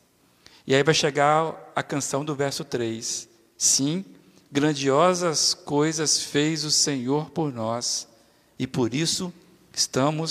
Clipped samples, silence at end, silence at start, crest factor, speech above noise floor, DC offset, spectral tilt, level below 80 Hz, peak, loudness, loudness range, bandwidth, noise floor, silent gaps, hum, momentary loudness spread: under 0.1%; 0 s; 0.65 s; 20 dB; 33 dB; under 0.1%; -3 dB/octave; -66 dBFS; -4 dBFS; -23 LUFS; 4 LU; 15.5 kHz; -57 dBFS; none; none; 10 LU